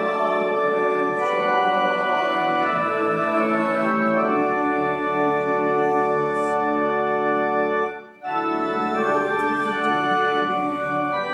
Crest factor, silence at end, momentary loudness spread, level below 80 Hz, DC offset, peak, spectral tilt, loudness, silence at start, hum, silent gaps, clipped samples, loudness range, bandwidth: 12 dB; 0 s; 3 LU; -60 dBFS; under 0.1%; -8 dBFS; -6 dB/octave; -21 LUFS; 0 s; none; none; under 0.1%; 2 LU; 11.5 kHz